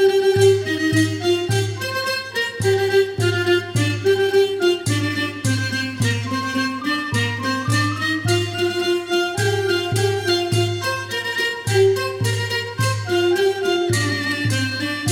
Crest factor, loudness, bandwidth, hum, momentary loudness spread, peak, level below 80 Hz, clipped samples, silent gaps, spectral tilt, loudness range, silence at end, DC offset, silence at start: 16 dB; -20 LUFS; 16.5 kHz; none; 5 LU; -4 dBFS; -56 dBFS; under 0.1%; none; -5 dB/octave; 2 LU; 0 s; under 0.1%; 0 s